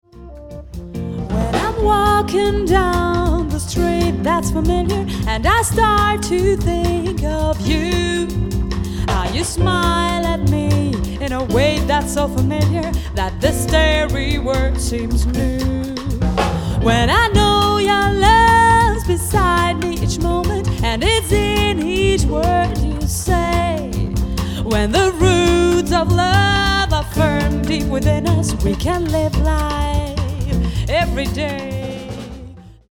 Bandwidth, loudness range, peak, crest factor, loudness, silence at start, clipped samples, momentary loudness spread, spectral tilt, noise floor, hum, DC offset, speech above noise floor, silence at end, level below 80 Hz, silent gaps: 17.5 kHz; 5 LU; 0 dBFS; 16 dB; -17 LUFS; 0.15 s; under 0.1%; 8 LU; -5 dB/octave; -37 dBFS; none; under 0.1%; 21 dB; 0.25 s; -24 dBFS; none